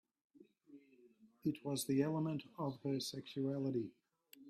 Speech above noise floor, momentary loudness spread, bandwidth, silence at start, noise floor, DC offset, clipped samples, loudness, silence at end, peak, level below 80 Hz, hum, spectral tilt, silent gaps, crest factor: 28 dB; 7 LU; 15 kHz; 0.7 s; -68 dBFS; under 0.1%; under 0.1%; -41 LUFS; 0 s; -22 dBFS; -82 dBFS; none; -6 dB/octave; none; 20 dB